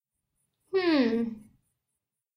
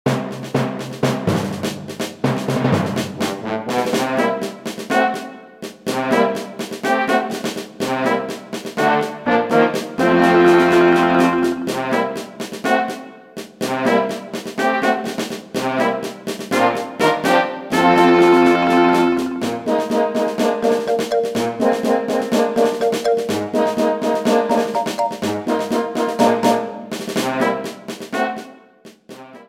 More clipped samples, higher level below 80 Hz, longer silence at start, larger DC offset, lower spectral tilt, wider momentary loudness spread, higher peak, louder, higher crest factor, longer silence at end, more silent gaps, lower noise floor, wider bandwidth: neither; second, -70 dBFS vs -58 dBFS; first, 0.75 s vs 0.05 s; neither; first, -6.5 dB/octave vs -5 dB/octave; about the same, 13 LU vs 14 LU; second, -14 dBFS vs -2 dBFS; second, -27 LUFS vs -18 LUFS; about the same, 18 dB vs 16 dB; first, 1 s vs 0.05 s; neither; first, -86 dBFS vs -45 dBFS; second, 10.5 kHz vs 16.5 kHz